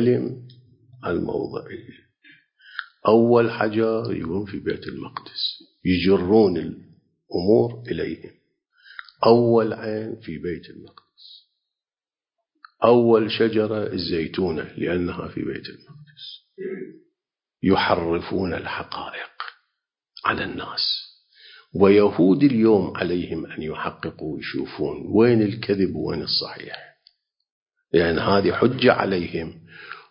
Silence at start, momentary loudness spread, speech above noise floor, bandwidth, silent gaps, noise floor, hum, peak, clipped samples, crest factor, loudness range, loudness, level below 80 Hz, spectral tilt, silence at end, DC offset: 0 s; 19 LU; over 69 dB; 5.4 kHz; 27.51-27.66 s; under -90 dBFS; none; -2 dBFS; under 0.1%; 22 dB; 7 LU; -22 LUFS; -50 dBFS; -10.5 dB/octave; 0.1 s; under 0.1%